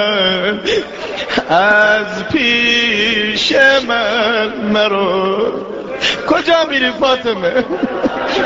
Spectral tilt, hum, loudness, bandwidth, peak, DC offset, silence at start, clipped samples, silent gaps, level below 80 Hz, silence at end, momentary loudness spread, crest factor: -1 dB/octave; none; -13 LUFS; 8 kHz; 0 dBFS; under 0.1%; 0 s; under 0.1%; none; -46 dBFS; 0 s; 8 LU; 14 dB